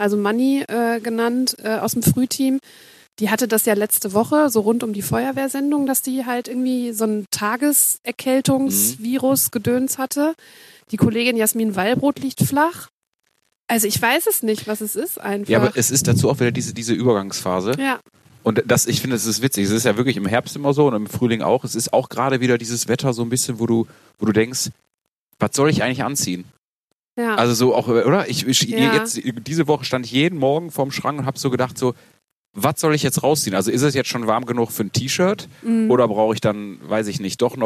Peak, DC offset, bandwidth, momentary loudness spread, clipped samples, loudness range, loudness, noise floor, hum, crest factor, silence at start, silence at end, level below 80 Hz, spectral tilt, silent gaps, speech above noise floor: -2 dBFS; under 0.1%; 14 kHz; 7 LU; under 0.1%; 3 LU; -19 LUFS; -77 dBFS; none; 18 dB; 0 s; 0 s; -58 dBFS; -4.5 dB/octave; 12.90-13.19 s, 13.60-13.64 s, 24.94-24.98 s, 25.08-25.27 s, 26.58-26.87 s, 26.95-27.16 s, 32.32-32.54 s; 58 dB